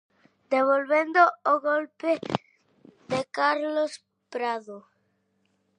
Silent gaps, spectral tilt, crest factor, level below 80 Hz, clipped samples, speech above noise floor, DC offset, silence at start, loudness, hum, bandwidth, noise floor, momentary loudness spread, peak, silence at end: none; -5 dB/octave; 22 dB; -72 dBFS; under 0.1%; 47 dB; under 0.1%; 0.5 s; -25 LUFS; none; 10 kHz; -72 dBFS; 14 LU; -6 dBFS; 1 s